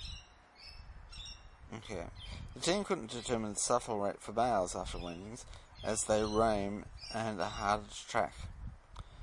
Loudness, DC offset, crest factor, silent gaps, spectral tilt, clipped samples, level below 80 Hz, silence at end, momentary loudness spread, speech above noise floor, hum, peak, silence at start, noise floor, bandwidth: -36 LUFS; under 0.1%; 22 dB; none; -4 dB/octave; under 0.1%; -52 dBFS; 0 s; 20 LU; 21 dB; none; -16 dBFS; 0 s; -57 dBFS; 11.5 kHz